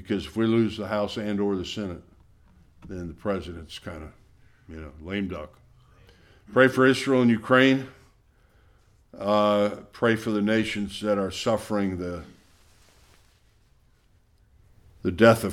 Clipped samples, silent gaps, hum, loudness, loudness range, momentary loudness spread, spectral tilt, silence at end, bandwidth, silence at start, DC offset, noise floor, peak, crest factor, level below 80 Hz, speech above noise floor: under 0.1%; none; none; -24 LUFS; 13 LU; 21 LU; -6 dB/octave; 0 s; 16 kHz; 0 s; under 0.1%; -61 dBFS; -4 dBFS; 24 dB; -54 dBFS; 37 dB